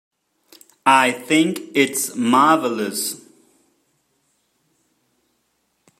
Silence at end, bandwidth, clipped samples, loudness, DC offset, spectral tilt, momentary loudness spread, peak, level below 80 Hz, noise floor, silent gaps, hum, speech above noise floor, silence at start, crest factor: 2.8 s; 15.5 kHz; under 0.1%; -18 LUFS; under 0.1%; -3 dB/octave; 9 LU; 0 dBFS; -72 dBFS; -69 dBFS; none; none; 51 dB; 0.85 s; 20 dB